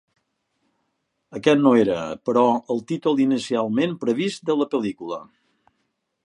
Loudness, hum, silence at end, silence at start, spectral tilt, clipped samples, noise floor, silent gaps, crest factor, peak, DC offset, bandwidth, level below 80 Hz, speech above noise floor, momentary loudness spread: -21 LUFS; none; 1 s; 1.3 s; -6 dB/octave; under 0.1%; -74 dBFS; none; 20 dB; -2 dBFS; under 0.1%; 10.5 kHz; -66 dBFS; 54 dB; 11 LU